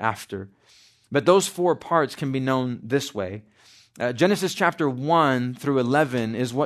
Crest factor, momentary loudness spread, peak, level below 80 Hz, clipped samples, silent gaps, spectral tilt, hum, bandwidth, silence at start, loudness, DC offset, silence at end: 18 dB; 13 LU; -4 dBFS; -68 dBFS; under 0.1%; none; -5.5 dB/octave; none; 13.5 kHz; 0 s; -23 LUFS; under 0.1%; 0 s